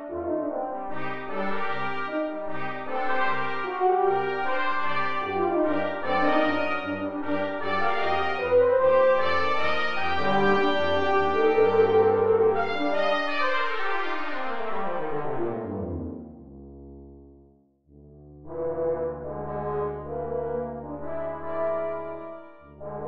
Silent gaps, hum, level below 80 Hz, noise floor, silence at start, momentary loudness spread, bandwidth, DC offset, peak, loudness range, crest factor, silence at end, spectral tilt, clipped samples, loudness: none; none; -52 dBFS; -59 dBFS; 0 s; 13 LU; 7 kHz; 1%; -10 dBFS; 12 LU; 16 dB; 0 s; -6.5 dB/octave; under 0.1%; -26 LUFS